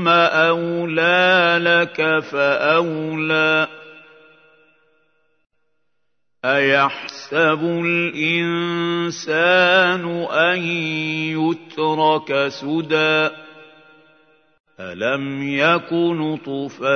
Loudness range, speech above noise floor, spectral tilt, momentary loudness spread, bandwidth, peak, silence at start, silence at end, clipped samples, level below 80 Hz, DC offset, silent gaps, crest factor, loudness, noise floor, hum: 7 LU; 59 dB; -5 dB/octave; 9 LU; 6.6 kHz; -2 dBFS; 0 s; 0 s; under 0.1%; -72 dBFS; under 0.1%; 14.60-14.64 s; 18 dB; -18 LUFS; -77 dBFS; none